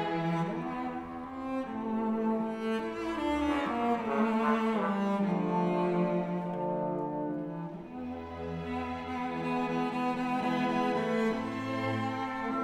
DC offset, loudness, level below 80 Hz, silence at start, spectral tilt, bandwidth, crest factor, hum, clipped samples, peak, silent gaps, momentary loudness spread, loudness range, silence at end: under 0.1%; -32 LUFS; -60 dBFS; 0 s; -7.5 dB/octave; 11.5 kHz; 18 dB; none; under 0.1%; -14 dBFS; none; 9 LU; 5 LU; 0 s